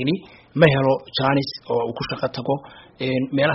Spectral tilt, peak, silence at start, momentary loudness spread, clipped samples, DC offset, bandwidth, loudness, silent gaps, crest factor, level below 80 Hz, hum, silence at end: -4.5 dB/octave; 0 dBFS; 0 s; 11 LU; under 0.1%; under 0.1%; 6 kHz; -22 LUFS; none; 22 dB; -52 dBFS; none; 0 s